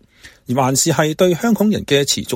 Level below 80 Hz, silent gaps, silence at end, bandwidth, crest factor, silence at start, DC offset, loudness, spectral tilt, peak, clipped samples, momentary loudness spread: -50 dBFS; none; 0 s; 16.5 kHz; 16 dB; 0.25 s; under 0.1%; -16 LUFS; -4 dB/octave; 0 dBFS; under 0.1%; 3 LU